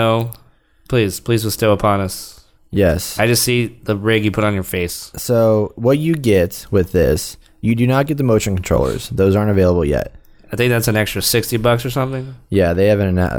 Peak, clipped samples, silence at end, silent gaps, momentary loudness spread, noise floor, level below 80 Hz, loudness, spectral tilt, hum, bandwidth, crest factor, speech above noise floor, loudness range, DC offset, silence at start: -2 dBFS; under 0.1%; 0 s; none; 8 LU; -51 dBFS; -34 dBFS; -16 LUFS; -5.5 dB/octave; none; over 20 kHz; 14 dB; 35 dB; 1 LU; under 0.1%; 0 s